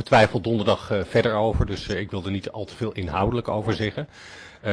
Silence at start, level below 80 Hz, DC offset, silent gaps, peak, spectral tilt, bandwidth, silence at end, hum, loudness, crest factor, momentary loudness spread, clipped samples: 0 s; -40 dBFS; under 0.1%; none; -6 dBFS; -6.5 dB/octave; 11 kHz; 0 s; none; -24 LUFS; 18 dB; 13 LU; under 0.1%